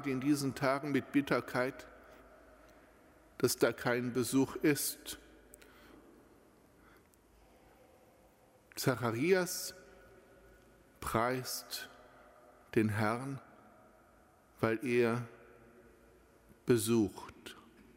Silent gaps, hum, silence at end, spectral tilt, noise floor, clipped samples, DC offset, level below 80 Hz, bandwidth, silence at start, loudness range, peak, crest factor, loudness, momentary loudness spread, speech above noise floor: none; none; 0.35 s; -5 dB/octave; -65 dBFS; under 0.1%; under 0.1%; -66 dBFS; 16 kHz; 0 s; 5 LU; -14 dBFS; 22 dB; -34 LUFS; 19 LU; 32 dB